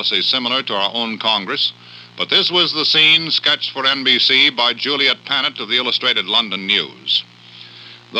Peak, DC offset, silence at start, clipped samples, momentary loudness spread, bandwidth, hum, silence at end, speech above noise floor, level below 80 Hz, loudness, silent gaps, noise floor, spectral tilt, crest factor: 0 dBFS; under 0.1%; 0 s; under 0.1%; 8 LU; 11 kHz; none; 0 s; 23 dB; -78 dBFS; -14 LUFS; none; -40 dBFS; -3 dB/octave; 16 dB